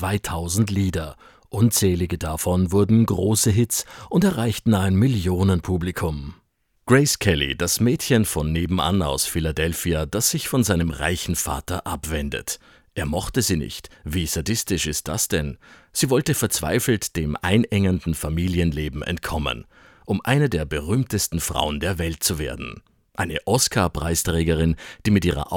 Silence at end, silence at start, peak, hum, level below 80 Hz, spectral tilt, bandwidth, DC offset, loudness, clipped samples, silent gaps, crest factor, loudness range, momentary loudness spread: 0 s; 0 s; -2 dBFS; none; -38 dBFS; -4.5 dB/octave; 19 kHz; under 0.1%; -22 LUFS; under 0.1%; none; 20 dB; 4 LU; 9 LU